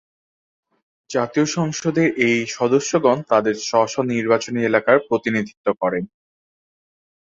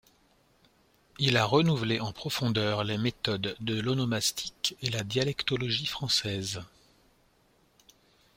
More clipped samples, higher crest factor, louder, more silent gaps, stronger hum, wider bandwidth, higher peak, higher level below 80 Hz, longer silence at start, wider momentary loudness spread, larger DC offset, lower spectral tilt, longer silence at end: neither; about the same, 20 dB vs 22 dB; first, -19 LUFS vs -29 LUFS; first, 5.57-5.64 s vs none; neither; second, 7.8 kHz vs 16.5 kHz; first, -2 dBFS vs -8 dBFS; about the same, -62 dBFS vs -60 dBFS; about the same, 1.1 s vs 1.2 s; about the same, 6 LU vs 7 LU; neither; about the same, -5 dB/octave vs -4.5 dB/octave; second, 1.35 s vs 1.7 s